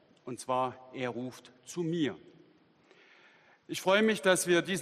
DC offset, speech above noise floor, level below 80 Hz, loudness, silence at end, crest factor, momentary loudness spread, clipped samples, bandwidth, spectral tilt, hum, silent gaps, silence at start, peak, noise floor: under 0.1%; 33 dB; -76 dBFS; -31 LUFS; 0 s; 22 dB; 18 LU; under 0.1%; 14 kHz; -4 dB/octave; none; none; 0.25 s; -12 dBFS; -64 dBFS